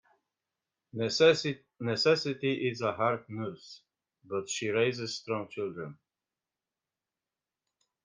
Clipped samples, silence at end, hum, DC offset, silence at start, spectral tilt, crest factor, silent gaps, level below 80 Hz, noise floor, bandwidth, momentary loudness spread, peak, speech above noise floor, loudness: under 0.1%; 2.1 s; none; under 0.1%; 0.95 s; -4.5 dB/octave; 22 dB; none; -76 dBFS; under -90 dBFS; 9.8 kHz; 16 LU; -12 dBFS; over 60 dB; -30 LUFS